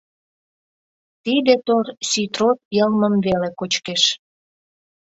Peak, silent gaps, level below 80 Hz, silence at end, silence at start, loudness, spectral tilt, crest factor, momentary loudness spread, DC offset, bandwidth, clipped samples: -2 dBFS; 2.65-2.71 s; -58 dBFS; 0.95 s; 1.25 s; -19 LUFS; -4 dB/octave; 20 dB; 6 LU; under 0.1%; 8 kHz; under 0.1%